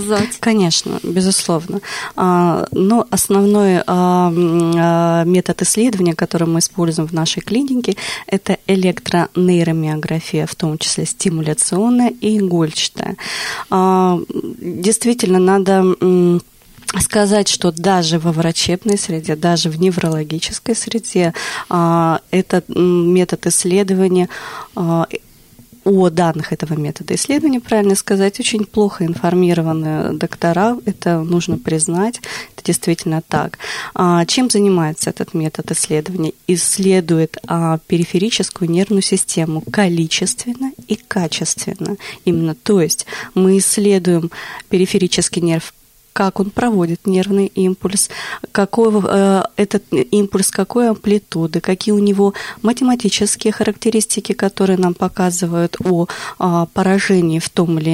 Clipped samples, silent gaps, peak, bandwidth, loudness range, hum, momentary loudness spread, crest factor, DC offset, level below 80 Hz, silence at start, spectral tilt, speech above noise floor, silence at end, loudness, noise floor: under 0.1%; none; -2 dBFS; 16 kHz; 3 LU; none; 7 LU; 12 dB; under 0.1%; -50 dBFS; 0 s; -5 dB/octave; 29 dB; 0 s; -15 LUFS; -44 dBFS